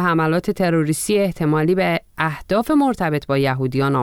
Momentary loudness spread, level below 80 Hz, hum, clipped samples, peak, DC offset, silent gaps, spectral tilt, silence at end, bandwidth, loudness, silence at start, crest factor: 4 LU; -46 dBFS; none; under 0.1%; -4 dBFS; under 0.1%; none; -6 dB/octave; 0 s; 17.5 kHz; -19 LUFS; 0 s; 14 dB